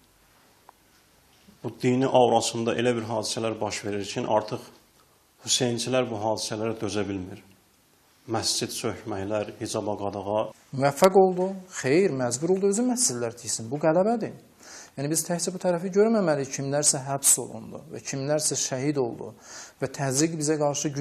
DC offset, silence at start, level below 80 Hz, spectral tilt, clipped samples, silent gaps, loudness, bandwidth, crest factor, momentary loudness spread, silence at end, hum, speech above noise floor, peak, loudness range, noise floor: under 0.1%; 1.65 s; -68 dBFS; -4 dB/octave; under 0.1%; none; -25 LUFS; 14 kHz; 24 dB; 15 LU; 0 s; none; 36 dB; -2 dBFS; 6 LU; -61 dBFS